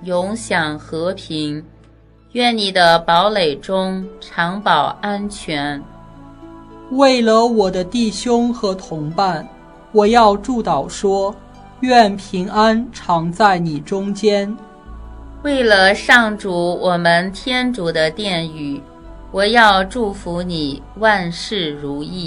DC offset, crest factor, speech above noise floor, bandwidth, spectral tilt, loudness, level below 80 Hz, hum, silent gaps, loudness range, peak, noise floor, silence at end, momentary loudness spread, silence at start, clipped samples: under 0.1%; 16 dB; 31 dB; 12.5 kHz; -4.5 dB/octave; -16 LUFS; -42 dBFS; none; none; 3 LU; 0 dBFS; -47 dBFS; 0 s; 13 LU; 0 s; under 0.1%